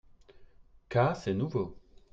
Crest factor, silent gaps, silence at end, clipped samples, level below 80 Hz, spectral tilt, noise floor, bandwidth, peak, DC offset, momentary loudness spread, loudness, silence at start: 20 dB; none; 0.35 s; under 0.1%; -58 dBFS; -8 dB/octave; -56 dBFS; 7.8 kHz; -14 dBFS; under 0.1%; 7 LU; -31 LUFS; 0.35 s